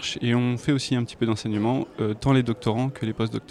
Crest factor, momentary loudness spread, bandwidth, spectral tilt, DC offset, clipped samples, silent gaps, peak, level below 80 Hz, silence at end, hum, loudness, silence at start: 14 dB; 6 LU; 11.5 kHz; -6.5 dB/octave; under 0.1%; under 0.1%; none; -10 dBFS; -52 dBFS; 0.05 s; none; -25 LUFS; 0 s